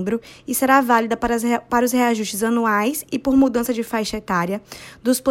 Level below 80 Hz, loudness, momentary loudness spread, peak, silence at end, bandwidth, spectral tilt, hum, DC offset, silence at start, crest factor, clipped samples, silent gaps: -48 dBFS; -20 LUFS; 9 LU; -4 dBFS; 0 s; 16.5 kHz; -4 dB/octave; none; under 0.1%; 0 s; 16 dB; under 0.1%; none